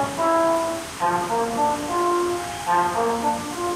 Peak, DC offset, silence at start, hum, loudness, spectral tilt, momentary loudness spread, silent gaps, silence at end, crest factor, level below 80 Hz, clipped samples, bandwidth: -10 dBFS; under 0.1%; 0 s; none; -22 LUFS; -4 dB/octave; 5 LU; none; 0 s; 12 dB; -52 dBFS; under 0.1%; 16 kHz